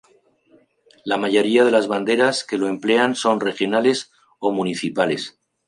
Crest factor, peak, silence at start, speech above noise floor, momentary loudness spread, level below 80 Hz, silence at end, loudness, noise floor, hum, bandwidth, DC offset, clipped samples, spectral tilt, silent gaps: 18 dB; -4 dBFS; 1.05 s; 39 dB; 10 LU; -70 dBFS; 0.4 s; -19 LUFS; -57 dBFS; none; 11 kHz; under 0.1%; under 0.1%; -4 dB/octave; none